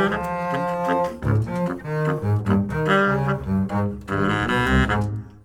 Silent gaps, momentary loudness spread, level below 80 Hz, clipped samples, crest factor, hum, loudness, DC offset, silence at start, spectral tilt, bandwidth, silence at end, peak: none; 6 LU; -36 dBFS; under 0.1%; 16 dB; none; -22 LUFS; under 0.1%; 0 s; -7 dB/octave; 15.5 kHz; 0.05 s; -6 dBFS